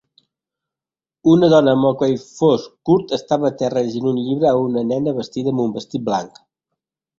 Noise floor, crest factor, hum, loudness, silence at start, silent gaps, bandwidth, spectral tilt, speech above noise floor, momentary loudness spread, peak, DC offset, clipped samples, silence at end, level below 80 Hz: under -90 dBFS; 16 dB; none; -18 LUFS; 1.25 s; none; 7.6 kHz; -7 dB/octave; over 73 dB; 10 LU; -2 dBFS; under 0.1%; under 0.1%; 0.9 s; -58 dBFS